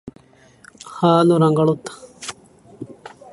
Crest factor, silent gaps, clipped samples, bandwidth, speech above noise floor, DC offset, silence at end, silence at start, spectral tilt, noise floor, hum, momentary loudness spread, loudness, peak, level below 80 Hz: 20 dB; none; under 0.1%; 11.5 kHz; 35 dB; under 0.1%; 0.4 s; 0.05 s; -7 dB/octave; -50 dBFS; none; 24 LU; -16 LUFS; -2 dBFS; -60 dBFS